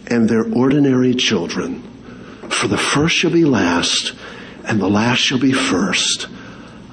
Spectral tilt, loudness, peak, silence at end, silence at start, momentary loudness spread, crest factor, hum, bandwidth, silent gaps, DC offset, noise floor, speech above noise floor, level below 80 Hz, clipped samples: -4 dB/octave; -16 LUFS; -4 dBFS; 0 s; 0 s; 19 LU; 12 dB; none; 10.5 kHz; none; under 0.1%; -36 dBFS; 20 dB; -48 dBFS; under 0.1%